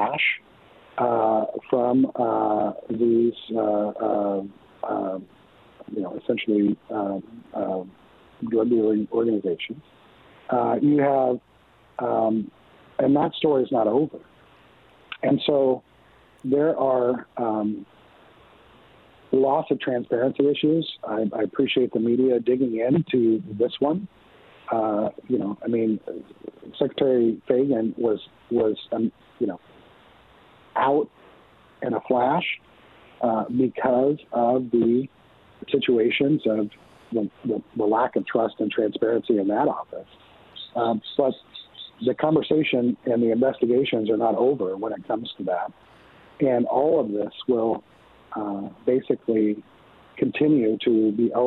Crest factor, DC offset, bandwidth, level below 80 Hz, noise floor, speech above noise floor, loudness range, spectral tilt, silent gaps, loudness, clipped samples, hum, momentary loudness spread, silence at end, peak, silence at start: 18 dB; under 0.1%; 4.3 kHz; -66 dBFS; -55 dBFS; 32 dB; 4 LU; -9.5 dB/octave; none; -24 LUFS; under 0.1%; none; 12 LU; 0 s; -6 dBFS; 0 s